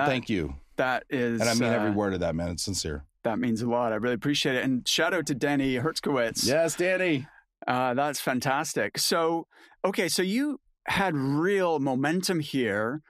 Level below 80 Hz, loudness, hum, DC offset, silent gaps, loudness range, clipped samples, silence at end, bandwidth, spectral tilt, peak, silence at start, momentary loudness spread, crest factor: -52 dBFS; -27 LUFS; none; under 0.1%; none; 2 LU; under 0.1%; 0.1 s; 15.5 kHz; -4 dB/octave; -8 dBFS; 0 s; 6 LU; 18 dB